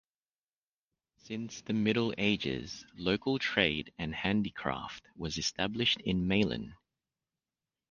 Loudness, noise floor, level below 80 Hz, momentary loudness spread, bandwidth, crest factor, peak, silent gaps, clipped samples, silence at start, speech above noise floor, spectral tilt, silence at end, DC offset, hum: -32 LUFS; under -90 dBFS; -56 dBFS; 12 LU; 7.4 kHz; 24 dB; -10 dBFS; none; under 0.1%; 1.25 s; over 57 dB; -4.5 dB/octave; 1.15 s; under 0.1%; none